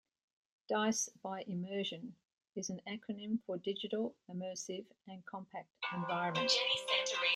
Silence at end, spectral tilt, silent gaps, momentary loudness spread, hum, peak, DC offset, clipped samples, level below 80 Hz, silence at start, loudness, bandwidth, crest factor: 0 s; -3 dB/octave; 2.34-2.38 s, 2.49-2.53 s; 17 LU; none; -18 dBFS; under 0.1%; under 0.1%; -84 dBFS; 0.7 s; -38 LUFS; 13.5 kHz; 22 dB